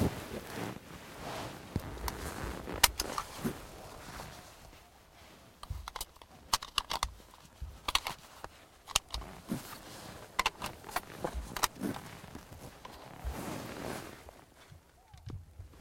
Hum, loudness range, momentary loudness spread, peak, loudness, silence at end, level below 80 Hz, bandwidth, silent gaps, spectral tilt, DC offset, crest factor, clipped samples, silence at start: none; 10 LU; 21 LU; -4 dBFS; -37 LUFS; 0 s; -50 dBFS; 16.5 kHz; none; -2.5 dB/octave; under 0.1%; 36 dB; under 0.1%; 0 s